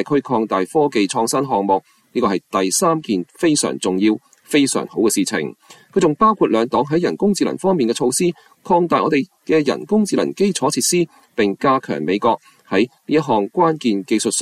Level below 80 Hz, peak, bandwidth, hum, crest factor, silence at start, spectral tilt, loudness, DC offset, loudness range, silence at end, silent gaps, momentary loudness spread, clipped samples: -58 dBFS; -2 dBFS; 15 kHz; none; 14 dB; 0 s; -4.5 dB/octave; -18 LUFS; under 0.1%; 1 LU; 0 s; none; 5 LU; under 0.1%